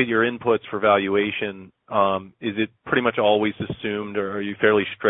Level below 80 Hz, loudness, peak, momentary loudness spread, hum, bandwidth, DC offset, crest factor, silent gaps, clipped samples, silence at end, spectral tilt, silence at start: -60 dBFS; -22 LUFS; -4 dBFS; 9 LU; none; 4 kHz; under 0.1%; 18 dB; none; under 0.1%; 0 s; -10 dB/octave; 0 s